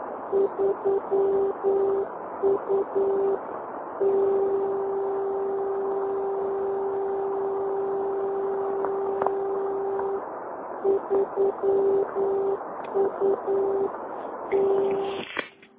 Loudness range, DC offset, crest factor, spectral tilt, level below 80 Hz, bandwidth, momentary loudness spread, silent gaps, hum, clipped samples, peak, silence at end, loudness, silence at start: 2 LU; under 0.1%; 20 dB; -9.5 dB/octave; -64 dBFS; 3.8 kHz; 7 LU; none; none; under 0.1%; -6 dBFS; 0.3 s; -26 LUFS; 0 s